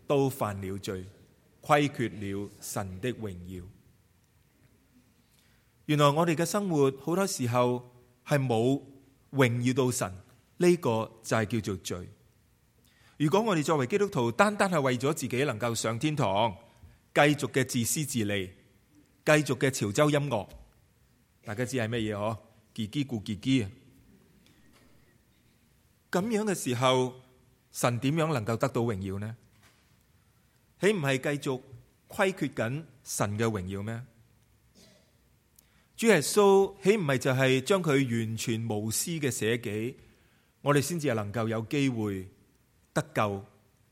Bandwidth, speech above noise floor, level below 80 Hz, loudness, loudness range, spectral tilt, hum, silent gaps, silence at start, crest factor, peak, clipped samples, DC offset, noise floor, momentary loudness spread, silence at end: 16.5 kHz; 38 dB; -66 dBFS; -29 LUFS; 8 LU; -5 dB/octave; none; none; 0.1 s; 24 dB; -6 dBFS; under 0.1%; under 0.1%; -66 dBFS; 14 LU; 0.45 s